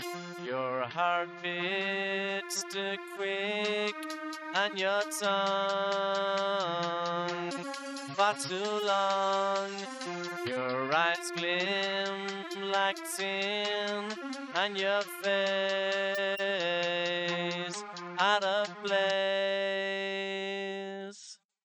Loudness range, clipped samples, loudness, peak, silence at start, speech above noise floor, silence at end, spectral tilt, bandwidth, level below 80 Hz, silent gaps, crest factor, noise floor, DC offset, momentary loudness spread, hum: 2 LU; under 0.1%; -31 LUFS; -14 dBFS; 0 s; 21 dB; 0.3 s; -3 dB/octave; 14.5 kHz; under -90 dBFS; none; 18 dB; -53 dBFS; under 0.1%; 9 LU; none